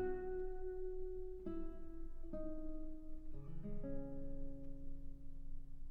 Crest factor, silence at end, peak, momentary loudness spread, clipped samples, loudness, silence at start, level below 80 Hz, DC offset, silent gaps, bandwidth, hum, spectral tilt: 12 dB; 0 s; -32 dBFS; 11 LU; under 0.1%; -50 LUFS; 0 s; -48 dBFS; under 0.1%; none; 2 kHz; none; -10 dB/octave